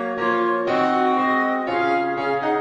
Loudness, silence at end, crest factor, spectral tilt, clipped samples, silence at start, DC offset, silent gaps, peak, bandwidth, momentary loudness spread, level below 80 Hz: -20 LUFS; 0 s; 12 dB; -6 dB/octave; under 0.1%; 0 s; under 0.1%; none; -8 dBFS; 9.2 kHz; 3 LU; -64 dBFS